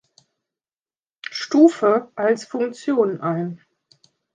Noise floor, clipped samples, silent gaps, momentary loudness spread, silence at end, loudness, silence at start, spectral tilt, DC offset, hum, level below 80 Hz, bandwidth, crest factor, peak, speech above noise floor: under -90 dBFS; under 0.1%; none; 16 LU; 0.8 s; -20 LUFS; 1.3 s; -6 dB/octave; under 0.1%; none; -74 dBFS; 9.4 kHz; 20 dB; -2 dBFS; over 71 dB